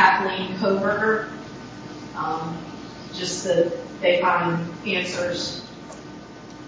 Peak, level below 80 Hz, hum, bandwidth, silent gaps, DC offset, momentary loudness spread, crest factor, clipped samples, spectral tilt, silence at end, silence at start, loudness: -2 dBFS; -56 dBFS; none; 8 kHz; none; under 0.1%; 18 LU; 22 dB; under 0.1%; -4 dB/octave; 0 s; 0 s; -23 LUFS